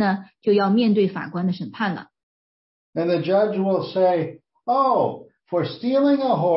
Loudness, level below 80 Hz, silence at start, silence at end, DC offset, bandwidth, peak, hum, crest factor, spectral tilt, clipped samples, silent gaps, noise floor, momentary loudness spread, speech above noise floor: -21 LUFS; -70 dBFS; 0 s; 0 s; under 0.1%; 5.8 kHz; -8 dBFS; none; 14 dB; -11.5 dB/octave; under 0.1%; 2.23-2.93 s; under -90 dBFS; 9 LU; over 70 dB